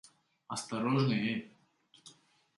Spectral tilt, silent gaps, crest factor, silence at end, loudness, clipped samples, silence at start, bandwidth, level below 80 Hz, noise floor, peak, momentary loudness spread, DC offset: -5.5 dB/octave; none; 18 dB; 0.45 s; -33 LUFS; under 0.1%; 0.5 s; 11.5 kHz; -76 dBFS; -67 dBFS; -18 dBFS; 11 LU; under 0.1%